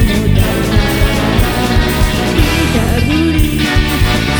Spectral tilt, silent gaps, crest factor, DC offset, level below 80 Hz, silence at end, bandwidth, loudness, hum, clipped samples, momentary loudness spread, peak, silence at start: -5.5 dB/octave; none; 12 dB; under 0.1%; -16 dBFS; 0 s; over 20 kHz; -12 LUFS; none; under 0.1%; 1 LU; 0 dBFS; 0 s